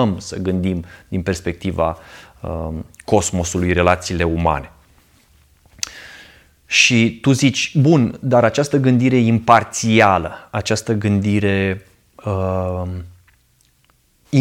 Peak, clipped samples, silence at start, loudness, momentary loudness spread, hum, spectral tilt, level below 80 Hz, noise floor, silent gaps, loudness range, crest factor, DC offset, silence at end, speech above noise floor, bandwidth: 0 dBFS; under 0.1%; 0 s; -17 LUFS; 15 LU; none; -5 dB/octave; -40 dBFS; -58 dBFS; none; 7 LU; 18 dB; under 0.1%; 0 s; 41 dB; 16 kHz